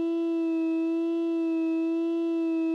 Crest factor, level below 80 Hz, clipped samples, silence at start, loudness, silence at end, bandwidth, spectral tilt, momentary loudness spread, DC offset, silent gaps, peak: 6 dB; under -90 dBFS; under 0.1%; 0 s; -27 LUFS; 0 s; 5.2 kHz; -5.5 dB/octave; 1 LU; under 0.1%; none; -22 dBFS